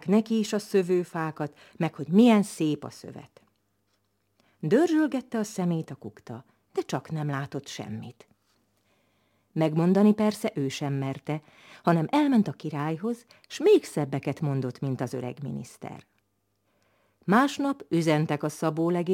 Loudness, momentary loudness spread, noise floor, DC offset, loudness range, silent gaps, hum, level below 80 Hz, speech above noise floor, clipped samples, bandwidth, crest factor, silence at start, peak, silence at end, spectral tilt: -27 LUFS; 18 LU; -74 dBFS; under 0.1%; 8 LU; none; none; -74 dBFS; 48 dB; under 0.1%; 16.5 kHz; 20 dB; 0.05 s; -6 dBFS; 0 s; -6.5 dB/octave